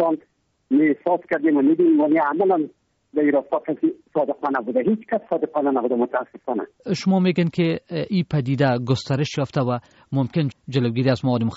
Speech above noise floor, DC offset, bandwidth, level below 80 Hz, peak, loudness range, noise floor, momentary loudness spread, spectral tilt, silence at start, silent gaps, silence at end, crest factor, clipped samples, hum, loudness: 40 dB; under 0.1%; 8 kHz; -60 dBFS; -6 dBFS; 3 LU; -61 dBFS; 9 LU; -6.5 dB/octave; 0 s; none; 0 s; 14 dB; under 0.1%; none; -22 LUFS